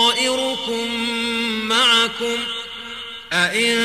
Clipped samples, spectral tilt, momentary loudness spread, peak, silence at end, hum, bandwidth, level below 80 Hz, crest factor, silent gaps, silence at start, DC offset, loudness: under 0.1%; -1.5 dB/octave; 15 LU; -4 dBFS; 0 s; none; 15.5 kHz; -58 dBFS; 16 dB; none; 0 s; 0.2%; -18 LUFS